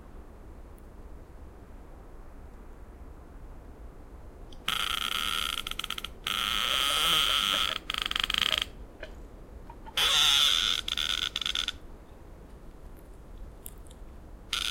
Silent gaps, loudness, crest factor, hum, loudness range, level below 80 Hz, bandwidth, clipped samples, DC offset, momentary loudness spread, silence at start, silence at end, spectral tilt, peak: none; -26 LUFS; 24 dB; none; 10 LU; -48 dBFS; 17 kHz; under 0.1%; under 0.1%; 27 LU; 0 s; 0 s; 0 dB/octave; -8 dBFS